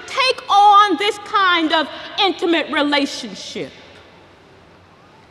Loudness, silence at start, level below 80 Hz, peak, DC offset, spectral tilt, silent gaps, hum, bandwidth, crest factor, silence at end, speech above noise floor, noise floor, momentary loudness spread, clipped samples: -15 LUFS; 0 s; -62 dBFS; -2 dBFS; under 0.1%; -2.5 dB/octave; none; none; 12.5 kHz; 16 dB; 1.6 s; 28 dB; -47 dBFS; 18 LU; under 0.1%